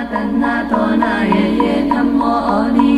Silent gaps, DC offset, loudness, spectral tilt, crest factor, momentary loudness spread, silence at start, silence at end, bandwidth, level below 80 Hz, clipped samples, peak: none; under 0.1%; -15 LUFS; -7 dB/octave; 14 dB; 2 LU; 0 s; 0 s; 11 kHz; -38 dBFS; under 0.1%; 0 dBFS